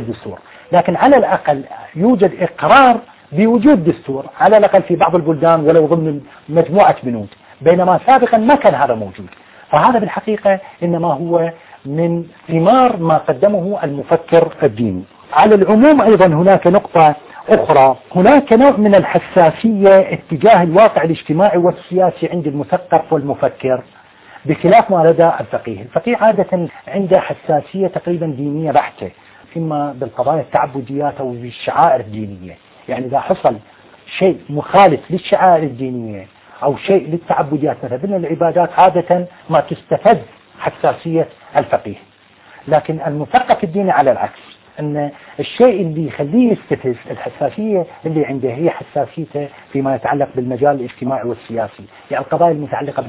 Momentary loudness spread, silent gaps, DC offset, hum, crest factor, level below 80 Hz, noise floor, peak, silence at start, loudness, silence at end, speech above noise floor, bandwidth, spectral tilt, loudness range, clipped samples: 14 LU; none; under 0.1%; none; 14 dB; -50 dBFS; -45 dBFS; 0 dBFS; 0 s; -14 LUFS; 0 s; 32 dB; 4 kHz; -11 dB/octave; 8 LU; under 0.1%